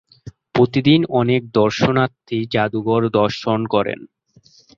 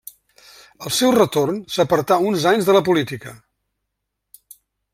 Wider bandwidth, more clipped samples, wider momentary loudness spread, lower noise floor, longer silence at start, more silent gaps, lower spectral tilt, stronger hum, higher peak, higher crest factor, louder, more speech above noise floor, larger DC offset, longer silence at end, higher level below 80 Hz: second, 7.4 kHz vs 16.5 kHz; neither; second, 7 LU vs 14 LU; second, -52 dBFS vs -78 dBFS; second, 0.25 s vs 0.8 s; neither; first, -7 dB/octave vs -4.5 dB/octave; neither; about the same, -2 dBFS vs -2 dBFS; about the same, 16 dB vs 18 dB; about the same, -18 LUFS vs -18 LUFS; second, 35 dB vs 60 dB; neither; second, 0.7 s vs 1.6 s; first, -52 dBFS vs -58 dBFS